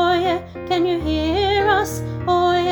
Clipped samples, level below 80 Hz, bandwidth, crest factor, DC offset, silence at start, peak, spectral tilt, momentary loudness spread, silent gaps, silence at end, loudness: under 0.1%; -36 dBFS; over 20 kHz; 14 dB; under 0.1%; 0 s; -6 dBFS; -5.5 dB/octave; 8 LU; none; 0 s; -19 LUFS